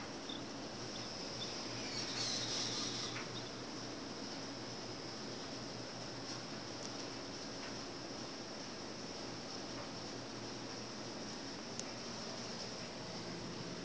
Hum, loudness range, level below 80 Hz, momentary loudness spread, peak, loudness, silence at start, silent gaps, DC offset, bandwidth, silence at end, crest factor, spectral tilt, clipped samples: none; 5 LU; -68 dBFS; 7 LU; -22 dBFS; -44 LUFS; 0 s; none; under 0.1%; 8 kHz; 0 s; 22 dB; -3 dB/octave; under 0.1%